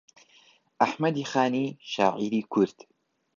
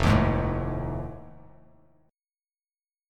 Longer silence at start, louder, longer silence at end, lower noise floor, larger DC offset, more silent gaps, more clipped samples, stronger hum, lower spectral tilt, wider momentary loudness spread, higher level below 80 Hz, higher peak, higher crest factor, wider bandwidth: first, 0.8 s vs 0 s; about the same, -27 LUFS vs -27 LUFS; second, 0.65 s vs 1.75 s; second, -60 dBFS vs under -90 dBFS; neither; neither; neither; neither; second, -5.5 dB/octave vs -7.5 dB/octave; second, 5 LU vs 17 LU; second, -74 dBFS vs -38 dBFS; about the same, -6 dBFS vs -8 dBFS; about the same, 22 dB vs 20 dB; second, 7.4 kHz vs 12.5 kHz